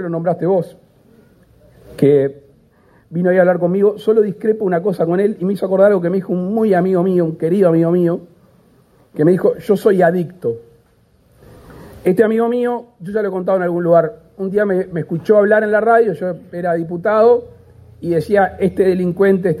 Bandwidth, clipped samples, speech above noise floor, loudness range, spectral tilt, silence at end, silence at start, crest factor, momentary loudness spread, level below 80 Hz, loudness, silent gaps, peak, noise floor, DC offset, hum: 14.5 kHz; under 0.1%; 39 dB; 3 LU; -9 dB/octave; 0 s; 0 s; 16 dB; 10 LU; -54 dBFS; -15 LUFS; none; 0 dBFS; -54 dBFS; under 0.1%; none